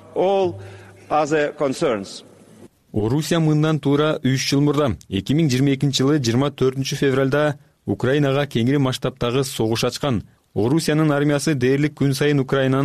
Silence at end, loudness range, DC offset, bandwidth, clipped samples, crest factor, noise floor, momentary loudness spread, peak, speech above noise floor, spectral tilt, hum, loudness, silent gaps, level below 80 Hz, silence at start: 0 s; 2 LU; under 0.1%; 14.5 kHz; under 0.1%; 12 dB; -47 dBFS; 7 LU; -8 dBFS; 28 dB; -6 dB/octave; none; -20 LUFS; none; -50 dBFS; 0.1 s